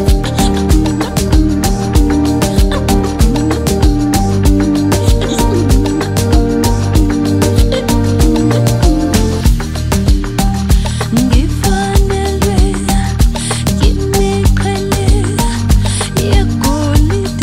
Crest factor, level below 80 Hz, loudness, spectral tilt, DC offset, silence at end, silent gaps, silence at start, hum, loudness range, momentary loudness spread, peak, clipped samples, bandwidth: 10 dB; -14 dBFS; -12 LUFS; -5.5 dB/octave; under 0.1%; 0 s; none; 0 s; none; 1 LU; 3 LU; 0 dBFS; under 0.1%; 16.5 kHz